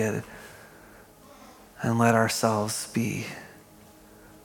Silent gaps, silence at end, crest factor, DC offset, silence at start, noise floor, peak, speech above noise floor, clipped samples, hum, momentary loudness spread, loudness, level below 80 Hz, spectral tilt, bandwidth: none; 0.85 s; 24 dB; under 0.1%; 0 s; -52 dBFS; -6 dBFS; 26 dB; under 0.1%; none; 24 LU; -26 LUFS; -64 dBFS; -5 dB/octave; 17.5 kHz